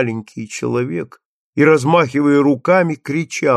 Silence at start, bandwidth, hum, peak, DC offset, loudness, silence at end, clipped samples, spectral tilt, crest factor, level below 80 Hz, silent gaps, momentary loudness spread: 0 s; 12 kHz; none; -2 dBFS; under 0.1%; -16 LUFS; 0 s; under 0.1%; -6.5 dB/octave; 14 dB; -62 dBFS; 1.25-1.53 s; 14 LU